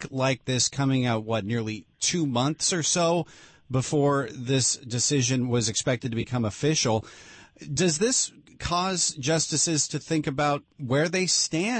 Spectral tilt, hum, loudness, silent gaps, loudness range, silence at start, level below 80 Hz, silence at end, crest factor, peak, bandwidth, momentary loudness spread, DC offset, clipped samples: -3.5 dB/octave; none; -25 LUFS; none; 1 LU; 0 s; -56 dBFS; 0 s; 14 dB; -12 dBFS; 8.8 kHz; 7 LU; under 0.1%; under 0.1%